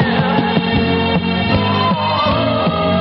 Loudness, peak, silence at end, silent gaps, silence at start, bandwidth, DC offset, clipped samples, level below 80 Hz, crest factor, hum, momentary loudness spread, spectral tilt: -15 LUFS; -2 dBFS; 0 s; none; 0 s; 6 kHz; under 0.1%; under 0.1%; -36 dBFS; 12 dB; none; 1 LU; -9 dB/octave